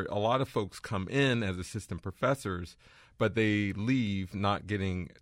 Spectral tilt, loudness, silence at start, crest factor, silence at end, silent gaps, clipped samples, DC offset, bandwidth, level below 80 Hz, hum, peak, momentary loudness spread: -6 dB/octave; -31 LUFS; 0 s; 16 dB; 0.15 s; none; under 0.1%; under 0.1%; 16 kHz; -58 dBFS; none; -14 dBFS; 10 LU